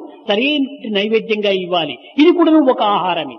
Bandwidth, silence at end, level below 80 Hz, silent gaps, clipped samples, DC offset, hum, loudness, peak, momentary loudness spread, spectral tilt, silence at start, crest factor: 6.2 kHz; 0 s; -70 dBFS; none; under 0.1%; under 0.1%; none; -15 LUFS; -2 dBFS; 8 LU; -6.5 dB/octave; 0 s; 14 dB